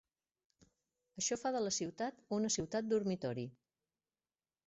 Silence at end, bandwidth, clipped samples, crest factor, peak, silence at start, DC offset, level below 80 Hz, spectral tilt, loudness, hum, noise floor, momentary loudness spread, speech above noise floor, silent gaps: 1.15 s; 8 kHz; under 0.1%; 16 dB; -24 dBFS; 1.15 s; under 0.1%; -74 dBFS; -4.5 dB/octave; -38 LUFS; none; under -90 dBFS; 8 LU; over 52 dB; none